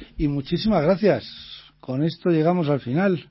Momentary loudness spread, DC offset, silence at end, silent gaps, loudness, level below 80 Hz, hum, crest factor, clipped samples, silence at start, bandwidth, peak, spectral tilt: 17 LU; under 0.1%; 0.1 s; none; -22 LUFS; -44 dBFS; none; 16 dB; under 0.1%; 0 s; 5.8 kHz; -6 dBFS; -11.5 dB/octave